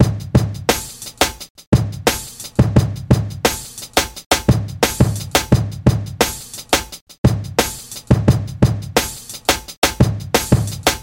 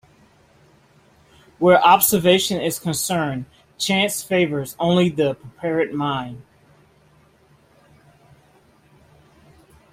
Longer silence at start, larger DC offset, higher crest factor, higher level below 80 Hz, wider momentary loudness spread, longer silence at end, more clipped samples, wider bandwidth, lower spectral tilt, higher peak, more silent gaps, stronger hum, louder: second, 0 s vs 1.6 s; neither; about the same, 18 dB vs 20 dB; first, -30 dBFS vs -58 dBFS; second, 6 LU vs 14 LU; second, 0 s vs 3.5 s; neither; about the same, 17 kHz vs 16 kHz; about the same, -4.5 dB/octave vs -4 dB/octave; about the same, 0 dBFS vs -2 dBFS; first, 1.50-1.55 s, 1.67-1.72 s, 4.26-4.30 s, 7.01-7.07 s, 7.18-7.24 s, 9.77-9.82 s vs none; neither; about the same, -18 LUFS vs -19 LUFS